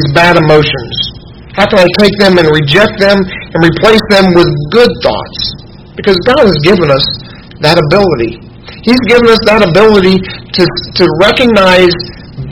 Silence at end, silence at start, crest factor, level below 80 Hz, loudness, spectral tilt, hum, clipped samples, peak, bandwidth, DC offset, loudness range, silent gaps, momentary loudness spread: 0 s; 0 s; 8 dB; -30 dBFS; -7 LUFS; -6 dB/octave; none; 4%; 0 dBFS; 17 kHz; 0.9%; 3 LU; none; 11 LU